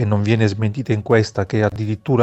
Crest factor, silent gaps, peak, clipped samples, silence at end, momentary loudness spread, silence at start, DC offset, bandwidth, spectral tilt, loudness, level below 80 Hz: 16 dB; none; -2 dBFS; under 0.1%; 0 s; 6 LU; 0 s; under 0.1%; 8.2 kHz; -7.5 dB/octave; -19 LUFS; -48 dBFS